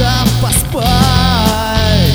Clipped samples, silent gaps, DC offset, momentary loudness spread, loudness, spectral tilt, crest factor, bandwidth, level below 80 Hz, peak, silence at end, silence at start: under 0.1%; none; under 0.1%; 3 LU; -12 LUFS; -4.5 dB/octave; 10 dB; over 20 kHz; -20 dBFS; 0 dBFS; 0 s; 0 s